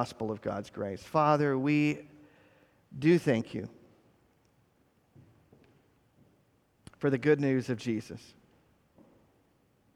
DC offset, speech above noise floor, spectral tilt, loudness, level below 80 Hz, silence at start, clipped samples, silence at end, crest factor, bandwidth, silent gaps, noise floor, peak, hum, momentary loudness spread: under 0.1%; 40 dB; -7.5 dB/octave; -30 LUFS; -70 dBFS; 0 s; under 0.1%; 1.75 s; 22 dB; 13 kHz; none; -69 dBFS; -12 dBFS; none; 15 LU